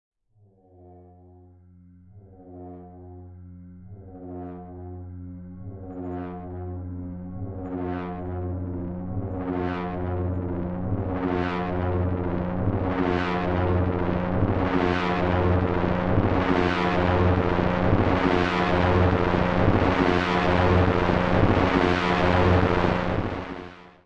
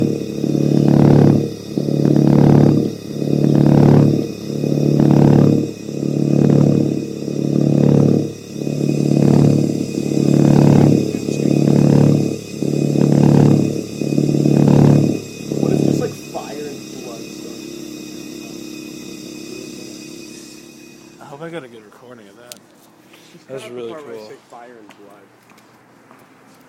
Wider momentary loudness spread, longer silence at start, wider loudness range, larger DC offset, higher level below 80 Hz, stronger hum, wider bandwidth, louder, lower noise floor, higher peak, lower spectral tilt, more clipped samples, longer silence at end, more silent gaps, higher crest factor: about the same, 19 LU vs 20 LU; first, 0.8 s vs 0 s; second, 17 LU vs 21 LU; neither; first, -40 dBFS vs -46 dBFS; neither; second, 7.4 kHz vs 14 kHz; second, -24 LUFS vs -15 LUFS; first, -60 dBFS vs -48 dBFS; second, -10 dBFS vs 0 dBFS; about the same, -8 dB/octave vs -8 dB/octave; neither; second, 0.15 s vs 2 s; neither; about the same, 14 dB vs 16 dB